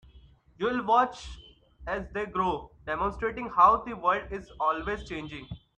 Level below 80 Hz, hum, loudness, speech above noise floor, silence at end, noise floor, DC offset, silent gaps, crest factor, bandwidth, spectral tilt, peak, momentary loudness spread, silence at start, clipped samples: -50 dBFS; none; -28 LUFS; 28 dB; 0.2 s; -56 dBFS; under 0.1%; none; 22 dB; 9.2 kHz; -6 dB/octave; -8 dBFS; 18 LU; 0.15 s; under 0.1%